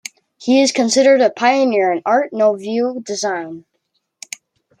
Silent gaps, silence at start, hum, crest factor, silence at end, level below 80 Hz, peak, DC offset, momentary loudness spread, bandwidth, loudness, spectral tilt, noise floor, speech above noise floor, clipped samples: none; 0.4 s; none; 14 dB; 1.2 s; -70 dBFS; -2 dBFS; under 0.1%; 20 LU; 11.5 kHz; -15 LUFS; -3 dB/octave; -70 dBFS; 54 dB; under 0.1%